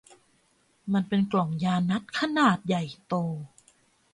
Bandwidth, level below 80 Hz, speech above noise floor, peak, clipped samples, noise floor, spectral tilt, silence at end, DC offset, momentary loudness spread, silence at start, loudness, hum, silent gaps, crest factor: 11 kHz; -66 dBFS; 41 dB; -10 dBFS; under 0.1%; -67 dBFS; -6.5 dB/octave; 0.65 s; under 0.1%; 11 LU; 0.85 s; -27 LUFS; none; none; 18 dB